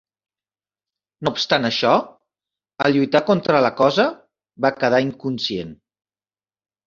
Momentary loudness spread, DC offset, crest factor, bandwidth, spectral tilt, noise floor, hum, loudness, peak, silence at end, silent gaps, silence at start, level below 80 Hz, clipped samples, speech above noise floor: 8 LU; under 0.1%; 20 dB; 7.4 kHz; -5.5 dB/octave; under -90 dBFS; none; -19 LUFS; 0 dBFS; 1.15 s; none; 1.2 s; -60 dBFS; under 0.1%; over 72 dB